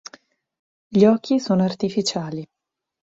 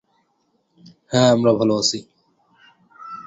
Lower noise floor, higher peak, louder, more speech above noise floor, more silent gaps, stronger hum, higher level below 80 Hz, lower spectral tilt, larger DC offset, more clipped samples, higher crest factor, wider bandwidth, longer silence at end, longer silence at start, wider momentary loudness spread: second, -52 dBFS vs -67 dBFS; about the same, -2 dBFS vs -2 dBFS; about the same, -20 LUFS vs -18 LUFS; second, 33 dB vs 49 dB; neither; neither; about the same, -64 dBFS vs -60 dBFS; first, -6 dB/octave vs -4.5 dB/octave; neither; neither; about the same, 20 dB vs 20 dB; about the same, 7.8 kHz vs 8.2 kHz; first, 0.6 s vs 0.05 s; second, 0.9 s vs 1.1 s; second, 13 LU vs 20 LU